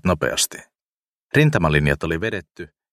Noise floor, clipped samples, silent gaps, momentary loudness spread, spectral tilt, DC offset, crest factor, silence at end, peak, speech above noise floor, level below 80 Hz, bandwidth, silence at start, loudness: under -90 dBFS; under 0.1%; 0.82-1.29 s, 2.51-2.55 s; 22 LU; -4.5 dB/octave; under 0.1%; 20 dB; 0.25 s; -2 dBFS; over 70 dB; -38 dBFS; 14.5 kHz; 0.05 s; -20 LUFS